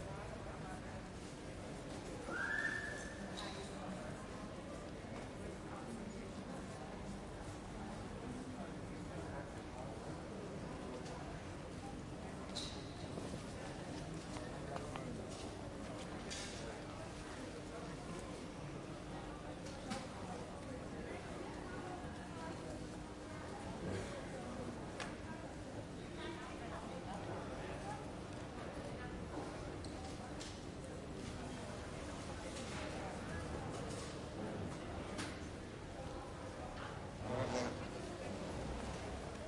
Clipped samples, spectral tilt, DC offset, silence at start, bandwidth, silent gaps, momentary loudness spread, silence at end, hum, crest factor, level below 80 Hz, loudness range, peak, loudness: under 0.1%; -5 dB/octave; under 0.1%; 0 s; 11.5 kHz; none; 4 LU; 0 s; none; 20 dB; -58 dBFS; 4 LU; -26 dBFS; -47 LUFS